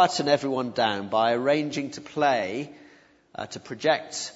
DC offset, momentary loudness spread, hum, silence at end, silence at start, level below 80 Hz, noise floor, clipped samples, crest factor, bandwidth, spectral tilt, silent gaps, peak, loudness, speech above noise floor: under 0.1%; 14 LU; none; 0.05 s; 0 s; -70 dBFS; -56 dBFS; under 0.1%; 20 dB; 8 kHz; -4 dB/octave; none; -6 dBFS; -25 LUFS; 30 dB